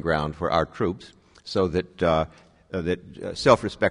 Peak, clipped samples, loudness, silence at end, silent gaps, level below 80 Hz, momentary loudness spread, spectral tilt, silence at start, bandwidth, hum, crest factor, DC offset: -2 dBFS; under 0.1%; -25 LUFS; 0 s; none; -46 dBFS; 14 LU; -6 dB/octave; 0 s; 10.5 kHz; none; 22 dB; under 0.1%